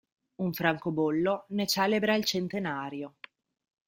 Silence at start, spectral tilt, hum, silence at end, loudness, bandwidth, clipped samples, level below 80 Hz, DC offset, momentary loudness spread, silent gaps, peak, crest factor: 0.4 s; -4.5 dB/octave; none; 0.8 s; -29 LUFS; 16.5 kHz; under 0.1%; -70 dBFS; under 0.1%; 10 LU; none; -8 dBFS; 22 dB